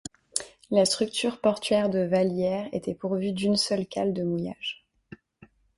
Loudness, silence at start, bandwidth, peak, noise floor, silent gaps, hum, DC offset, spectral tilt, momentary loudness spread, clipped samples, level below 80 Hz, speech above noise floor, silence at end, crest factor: -27 LUFS; 0.35 s; 11.5 kHz; -6 dBFS; -57 dBFS; none; none; under 0.1%; -4.5 dB/octave; 8 LU; under 0.1%; -62 dBFS; 31 dB; 0.6 s; 22 dB